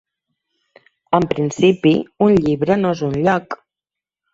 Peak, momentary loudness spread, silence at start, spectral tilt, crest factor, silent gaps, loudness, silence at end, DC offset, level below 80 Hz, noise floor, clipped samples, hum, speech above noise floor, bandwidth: -2 dBFS; 6 LU; 1.1 s; -7 dB/octave; 16 dB; none; -17 LUFS; 0.8 s; under 0.1%; -50 dBFS; -87 dBFS; under 0.1%; none; 71 dB; 7.8 kHz